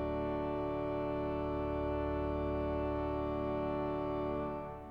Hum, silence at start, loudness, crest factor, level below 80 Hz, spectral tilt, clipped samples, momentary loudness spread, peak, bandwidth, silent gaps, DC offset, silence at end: none; 0 s; -37 LUFS; 12 dB; -46 dBFS; -9.5 dB/octave; under 0.1%; 1 LU; -24 dBFS; 5.6 kHz; none; under 0.1%; 0 s